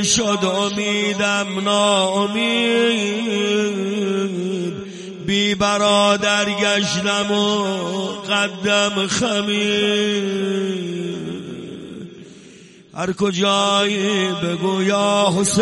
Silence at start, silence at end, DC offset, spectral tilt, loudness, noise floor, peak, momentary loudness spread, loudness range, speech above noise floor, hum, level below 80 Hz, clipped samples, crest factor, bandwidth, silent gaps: 0 s; 0 s; under 0.1%; -3.5 dB/octave; -18 LUFS; -44 dBFS; -2 dBFS; 11 LU; 5 LU; 25 dB; none; -56 dBFS; under 0.1%; 18 dB; 11.5 kHz; none